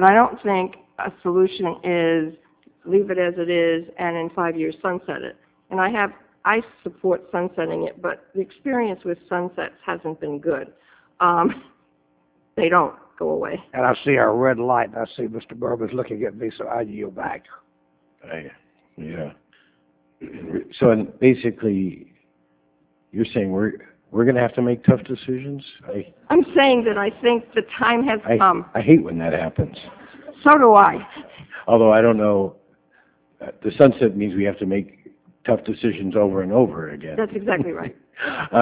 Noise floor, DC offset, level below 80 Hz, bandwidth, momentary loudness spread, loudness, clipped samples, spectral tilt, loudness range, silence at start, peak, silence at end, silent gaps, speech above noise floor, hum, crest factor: -63 dBFS; under 0.1%; -54 dBFS; 4 kHz; 17 LU; -20 LUFS; under 0.1%; -10.5 dB/octave; 10 LU; 0 s; 0 dBFS; 0 s; none; 43 dB; none; 20 dB